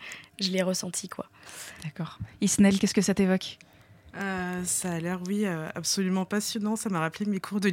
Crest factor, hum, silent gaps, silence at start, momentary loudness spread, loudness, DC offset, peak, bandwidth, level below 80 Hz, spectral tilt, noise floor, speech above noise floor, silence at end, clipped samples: 18 dB; none; none; 0 s; 16 LU; -28 LUFS; under 0.1%; -12 dBFS; 17 kHz; -60 dBFS; -4.5 dB/octave; -53 dBFS; 26 dB; 0 s; under 0.1%